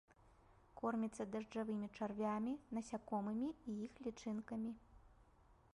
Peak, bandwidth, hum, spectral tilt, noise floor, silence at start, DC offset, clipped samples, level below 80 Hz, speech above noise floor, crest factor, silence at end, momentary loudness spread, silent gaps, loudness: -30 dBFS; 11.5 kHz; none; -6.5 dB/octave; -70 dBFS; 0.25 s; under 0.1%; under 0.1%; -72 dBFS; 26 dB; 16 dB; 0.2 s; 7 LU; none; -45 LUFS